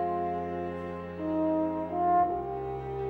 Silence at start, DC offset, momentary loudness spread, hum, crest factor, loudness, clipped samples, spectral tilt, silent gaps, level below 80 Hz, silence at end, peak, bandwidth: 0 s; under 0.1%; 10 LU; none; 14 dB; -31 LUFS; under 0.1%; -9.5 dB/octave; none; -54 dBFS; 0 s; -16 dBFS; 4.7 kHz